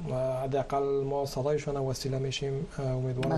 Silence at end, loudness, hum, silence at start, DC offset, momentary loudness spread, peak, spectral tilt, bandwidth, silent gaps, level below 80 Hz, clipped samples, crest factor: 0 s; -31 LUFS; none; 0 s; under 0.1%; 3 LU; -18 dBFS; -6 dB/octave; 13 kHz; none; -48 dBFS; under 0.1%; 14 dB